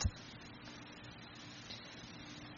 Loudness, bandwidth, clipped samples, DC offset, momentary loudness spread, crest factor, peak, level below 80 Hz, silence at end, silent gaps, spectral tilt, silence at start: -50 LUFS; 7.2 kHz; under 0.1%; under 0.1%; 3 LU; 24 dB; -22 dBFS; -52 dBFS; 0 s; none; -4 dB/octave; 0 s